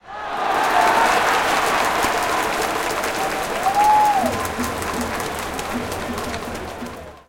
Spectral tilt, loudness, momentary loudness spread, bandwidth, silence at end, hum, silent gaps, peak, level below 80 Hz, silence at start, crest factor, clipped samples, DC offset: -3 dB/octave; -20 LUFS; 12 LU; 17 kHz; 0.1 s; none; none; -4 dBFS; -44 dBFS; 0.05 s; 16 dB; under 0.1%; under 0.1%